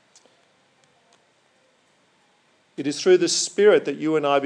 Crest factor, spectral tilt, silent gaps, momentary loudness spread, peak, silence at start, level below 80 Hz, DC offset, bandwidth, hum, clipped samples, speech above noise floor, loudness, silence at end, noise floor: 18 dB; -3.5 dB/octave; none; 12 LU; -4 dBFS; 2.75 s; under -90 dBFS; under 0.1%; 10.5 kHz; none; under 0.1%; 43 dB; -20 LUFS; 0 s; -62 dBFS